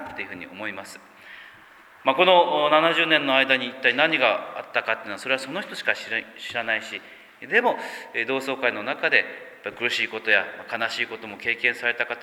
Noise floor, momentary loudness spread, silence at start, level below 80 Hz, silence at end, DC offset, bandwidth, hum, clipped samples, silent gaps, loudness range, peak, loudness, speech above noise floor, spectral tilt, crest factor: -50 dBFS; 15 LU; 0 s; -72 dBFS; 0 s; under 0.1%; 17 kHz; none; under 0.1%; none; 6 LU; -2 dBFS; -22 LUFS; 26 dB; -3.5 dB/octave; 22 dB